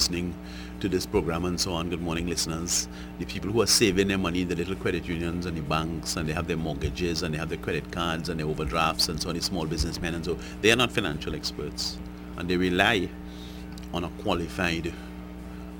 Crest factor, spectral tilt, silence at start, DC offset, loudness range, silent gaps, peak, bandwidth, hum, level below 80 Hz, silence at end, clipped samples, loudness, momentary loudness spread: 24 dB; -4 dB/octave; 0 s; under 0.1%; 4 LU; none; -4 dBFS; over 20 kHz; none; -42 dBFS; 0 s; under 0.1%; -27 LUFS; 14 LU